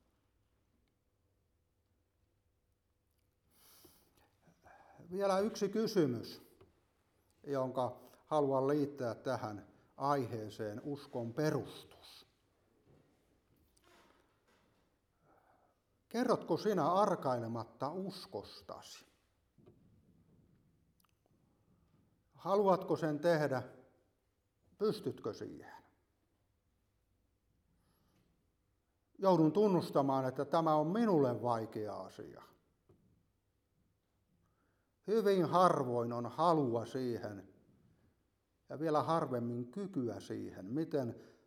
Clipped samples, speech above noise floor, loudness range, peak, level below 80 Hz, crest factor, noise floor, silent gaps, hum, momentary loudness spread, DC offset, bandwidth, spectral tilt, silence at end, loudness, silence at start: under 0.1%; 45 dB; 11 LU; -14 dBFS; -80 dBFS; 24 dB; -80 dBFS; none; none; 19 LU; under 0.1%; 16.5 kHz; -7 dB/octave; 0.2 s; -36 LUFS; 5 s